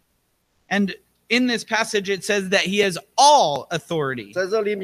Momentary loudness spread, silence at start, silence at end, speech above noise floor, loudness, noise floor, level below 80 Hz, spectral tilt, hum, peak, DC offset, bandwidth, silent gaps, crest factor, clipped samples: 12 LU; 0.7 s; 0 s; 48 dB; -20 LUFS; -68 dBFS; -64 dBFS; -3 dB/octave; none; -2 dBFS; under 0.1%; 15.5 kHz; none; 18 dB; under 0.1%